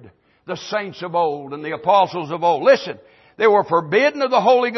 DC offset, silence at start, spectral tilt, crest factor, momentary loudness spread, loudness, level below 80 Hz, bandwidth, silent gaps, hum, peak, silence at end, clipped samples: under 0.1%; 0.5 s; -5 dB/octave; 16 dB; 13 LU; -18 LUFS; -68 dBFS; 6.2 kHz; none; none; -4 dBFS; 0 s; under 0.1%